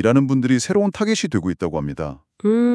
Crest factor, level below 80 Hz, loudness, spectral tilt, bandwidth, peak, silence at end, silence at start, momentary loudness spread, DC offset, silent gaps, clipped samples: 16 dB; -50 dBFS; -20 LUFS; -6 dB/octave; 12 kHz; -2 dBFS; 0 s; 0 s; 10 LU; under 0.1%; none; under 0.1%